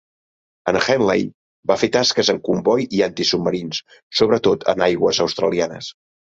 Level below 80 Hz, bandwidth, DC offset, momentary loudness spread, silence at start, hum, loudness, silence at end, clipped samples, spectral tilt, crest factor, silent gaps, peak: -54 dBFS; 8 kHz; under 0.1%; 11 LU; 0.65 s; none; -19 LUFS; 0.3 s; under 0.1%; -4 dB/octave; 18 dB; 1.34-1.63 s, 4.03-4.10 s; -2 dBFS